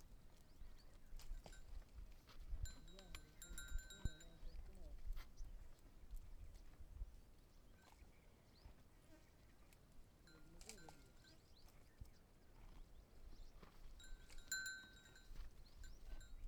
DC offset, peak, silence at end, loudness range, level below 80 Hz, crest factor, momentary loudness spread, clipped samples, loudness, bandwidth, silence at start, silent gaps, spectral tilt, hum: under 0.1%; -30 dBFS; 0 s; 11 LU; -58 dBFS; 26 dB; 15 LU; under 0.1%; -59 LUFS; over 20 kHz; 0 s; none; -2.5 dB/octave; none